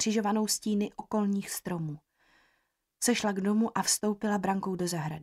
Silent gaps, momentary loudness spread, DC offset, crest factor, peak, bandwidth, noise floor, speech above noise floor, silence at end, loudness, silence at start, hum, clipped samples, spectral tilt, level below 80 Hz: none; 7 LU; under 0.1%; 18 dB; -14 dBFS; 15.5 kHz; -76 dBFS; 47 dB; 0 s; -30 LUFS; 0 s; none; under 0.1%; -4 dB/octave; -68 dBFS